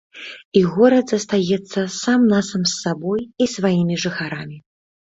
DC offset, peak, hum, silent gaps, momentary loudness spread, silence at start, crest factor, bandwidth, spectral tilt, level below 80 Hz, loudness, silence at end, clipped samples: under 0.1%; -2 dBFS; none; 0.45-0.52 s; 13 LU; 0.15 s; 18 dB; 8 kHz; -5 dB/octave; -58 dBFS; -19 LUFS; 0.45 s; under 0.1%